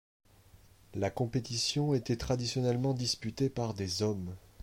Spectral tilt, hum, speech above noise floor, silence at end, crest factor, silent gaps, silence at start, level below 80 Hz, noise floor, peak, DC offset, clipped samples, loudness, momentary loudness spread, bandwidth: -5 dB/octave; none; 27 dB; 0 s; 16 dB; none; 0.9 s; -56 dBFS; -60 dBFS; -18 dBFS; under 0.1%; under 0.1%; -33 LUFS; 5 LU; 16.5 kHz